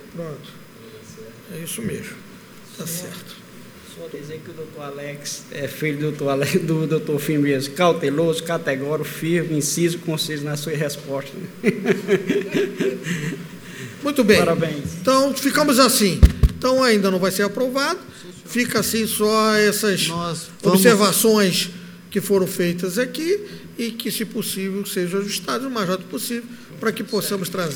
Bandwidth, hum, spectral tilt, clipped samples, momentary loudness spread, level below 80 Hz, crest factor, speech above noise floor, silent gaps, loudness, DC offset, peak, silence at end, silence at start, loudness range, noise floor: over 20 kHz; none; -4.5 dB/octave; under 0.1%; 19 LU; -32 dBFS; 20 dB; 21 dB; none; -20 LUFS; under 0.1%; 0 dBFS; 0 s; 0 s; 15 LU; -41 dBFS